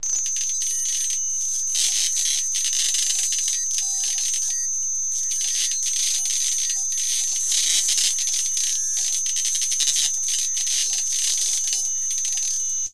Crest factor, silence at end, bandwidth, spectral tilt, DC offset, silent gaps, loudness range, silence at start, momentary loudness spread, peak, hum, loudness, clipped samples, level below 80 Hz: 18 dB; 0 s; 16 kHz; 4.5 dB/octave; 2%; none; 1 LU; 0.05 s; 3 LU; -4 dBFS; none; -20 LUFS; under 0.1%; -66 dBFS